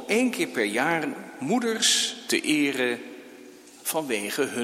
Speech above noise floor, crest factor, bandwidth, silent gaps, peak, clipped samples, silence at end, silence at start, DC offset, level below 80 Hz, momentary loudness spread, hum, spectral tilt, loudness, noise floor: 22 dB; 18 dB; 16.5 kHz; none; -8 dBFS; under 0.1%; 0 s; 0 s; under 0.1%; -76 dBFS; 13 LU; none; -2 dB/octave; -25 LUFS; -47 dBFS